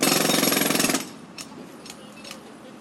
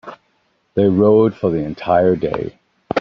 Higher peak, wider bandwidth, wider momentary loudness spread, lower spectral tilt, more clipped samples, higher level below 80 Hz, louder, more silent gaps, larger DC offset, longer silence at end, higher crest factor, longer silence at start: second, -6 dBFS vs -2 dBFS; first, 17 kHz vs 5.8 kHz; first, 21 LU vs 12 LU; second, -2 dB/octave vs -7 dB/octave; neither; second, -68 dBFS vs -50 dBFS; second, -21 LUFS vs -16 LUFS; neither; neither; about the same, 0 s vs 0 s; first, 20 dB vs 14 dB; about the same, 0 s vs 0.05 s